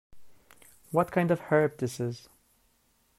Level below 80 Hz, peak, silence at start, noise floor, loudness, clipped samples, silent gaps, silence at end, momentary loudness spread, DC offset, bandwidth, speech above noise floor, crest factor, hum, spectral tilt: -66 dBFS; -10 dBFS; 0.15 s; -69 dBFS; -28 LUFS; under 0.1%; none; 1 s; 10 LU; under 0.1%; 15.5 kHz; 41 dB; 20 dB; none; -7 dB/octave